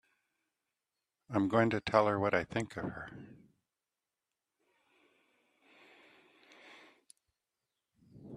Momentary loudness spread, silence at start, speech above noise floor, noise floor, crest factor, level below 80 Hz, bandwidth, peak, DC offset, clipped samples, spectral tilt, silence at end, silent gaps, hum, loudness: 23 LU; 1.3 s; over 58 dB; under -90 dBFS; 28 dB; -70 dBFS; 12 kHz; -10 dBFS; under 0.1%; under 0.1%; -6.5 dB/octave; 0 s; none; none; -32 LUFS